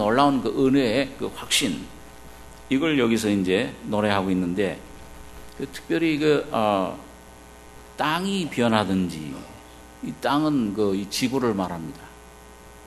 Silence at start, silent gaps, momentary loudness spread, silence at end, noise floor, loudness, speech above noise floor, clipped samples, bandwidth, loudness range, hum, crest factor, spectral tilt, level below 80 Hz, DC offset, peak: 0 s; none; 22 LU; 0 s; -46 dBFS; -23 LUFS; 23 dB; under 0.1%; 13 kHz; 3 LU; none; 22 dB; -5 dB/octave; -50 dBFS; under 0.1%; -2 dBFS